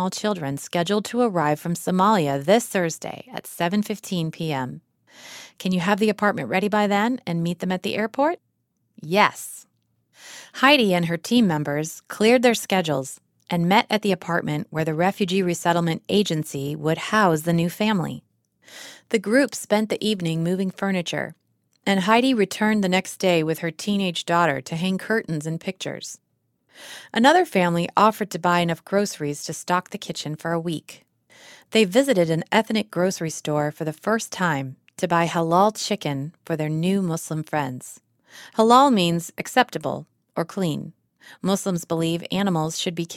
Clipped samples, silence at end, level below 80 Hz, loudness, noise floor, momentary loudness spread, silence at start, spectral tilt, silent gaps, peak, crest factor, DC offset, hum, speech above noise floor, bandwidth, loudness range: under 0.1%; 0 s; -64 dBFS; -22 LUFS; -72 dBFS; 13 LU; 0 s; -5 dB/octave; none; 0 dBFS; 22 dB; under 0.1%; none; 50 dB; 16.5 kHz; 4 LU